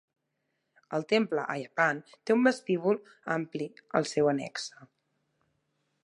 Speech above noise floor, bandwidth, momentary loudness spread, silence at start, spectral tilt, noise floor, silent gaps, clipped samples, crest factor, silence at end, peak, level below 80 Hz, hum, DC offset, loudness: 51 dB; 11 kHz; 12 LU; 0.9 s; -5 dB/octave; -80 dBFS; none; under 0.1%; 22 dB; 1.2 s; -10 dBFS; -80 dBFS; none; under 0.1%; -30 LUFS